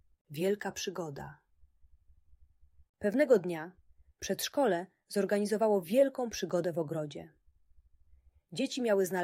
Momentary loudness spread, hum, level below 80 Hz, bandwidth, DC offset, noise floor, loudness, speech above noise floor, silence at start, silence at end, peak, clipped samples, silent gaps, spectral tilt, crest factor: 16 LU; none; -68 dBFS; 16 kHz; under 0.1%; -64 dBFS; -32 LUFS; 32 dB; 0.3 s; 0 s; -14 dBFS; under 0.1%; 2.89-2.94 s; -5 dB/octave; 20 dB